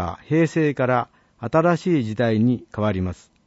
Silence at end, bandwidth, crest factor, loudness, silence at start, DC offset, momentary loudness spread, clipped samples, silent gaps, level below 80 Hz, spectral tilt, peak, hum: 0.3 s; 8 kHz; 16 dB; -21 LUFS; 0 s; under 0.1%; 8 LU; under 0.1%; none; -52 dBFS; -8 dB/octave; -6 dBFS; none